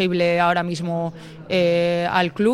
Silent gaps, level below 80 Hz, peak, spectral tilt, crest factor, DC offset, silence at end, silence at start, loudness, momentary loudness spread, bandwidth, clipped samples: none; -56 dBFS; -4 dBFS; -6 dB/octave; 16 dB; under 0.1%; 0 s; 0 s; -20 LUFS; 8 LU; 12 kHz; under 0.1%